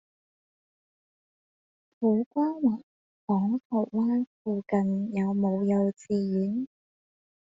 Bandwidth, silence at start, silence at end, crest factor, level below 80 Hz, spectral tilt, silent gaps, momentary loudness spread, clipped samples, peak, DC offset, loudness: 7.6 kHz; 2 s; 0.8 s; 16 dB; -70 dBFS; -10 dB/octave; 2.26-2.31 s, 2.83-3.27 s, 3.65-3.70 s, 4.27-4.45 s; 6 LU; under 0.1%; -12 dBFS; under 0.1%; -28 LUFS